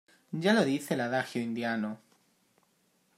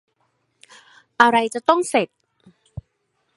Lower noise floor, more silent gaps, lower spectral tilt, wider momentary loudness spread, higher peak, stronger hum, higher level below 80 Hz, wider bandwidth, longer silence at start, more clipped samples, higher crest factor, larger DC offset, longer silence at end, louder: about the same, -71 dBFS vs -71 dBFS; neither; first, -5.5 dB/octave vs -3.5 dB/octave; second, 13 LU vs 25 LU; second, -10 dBFS vs 0 dBFS; neither; second, -80 dBFS vs -56 dBFS; first, 15.5 kHz vs 11.5 kHz; second, 0.3 s vs 1.2 s; neither; about the same, 22 dB vs 22 dB; neither; first, 1.2 s vs 0.55 s; second, -30 LUFS vs -18 LUFS